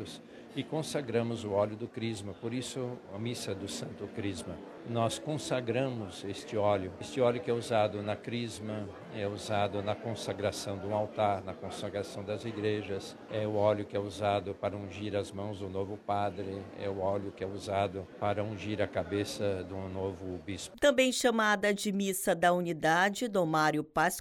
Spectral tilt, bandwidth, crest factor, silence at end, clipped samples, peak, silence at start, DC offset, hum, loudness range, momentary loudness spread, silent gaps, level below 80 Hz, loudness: -5 dB/octave; 16 kHz; 20 dB; 0 s; under 0.1%; -12 dBFS; 0 s; under 0.1%; none; 7 LU; 12 LU; none; -66 dBFS; -33 LUFS